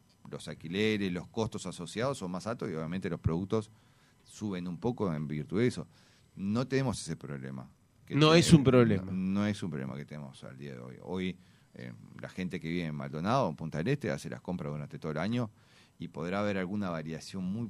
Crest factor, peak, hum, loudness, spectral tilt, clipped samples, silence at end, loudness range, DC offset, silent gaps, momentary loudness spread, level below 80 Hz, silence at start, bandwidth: 24 dB; -8 dBFS; none; -32 LUFS; -6 dB/octave; under 0.1%; 0 s; 9 LU; under 0.1%; none; 18 LU; -58 dBFS; 0.25 s; 13 kHz